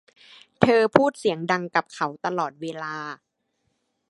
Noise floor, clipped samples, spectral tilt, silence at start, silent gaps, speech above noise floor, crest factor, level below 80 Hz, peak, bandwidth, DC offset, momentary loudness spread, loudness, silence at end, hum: -74 dBFS; under 0.1%; -6 dB/octave; 0.6 s; none; 50 dB; 24 dB; -62 dBFS; 0 dBFS; 11.5 kHz; under 0.1%; 14 LU; -23 LUFS; 0.95 s; none